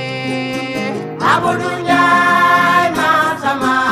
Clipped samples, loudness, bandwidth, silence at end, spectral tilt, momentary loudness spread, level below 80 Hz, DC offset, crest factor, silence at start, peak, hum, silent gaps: under 0.1%; -14 LUFS; 15.5 kHz; 0 s; -4.5 dB/octave; 10 LU; -52 dBFS; under 0.1%; 14 dB; 0 s; 0 dBFS; none; none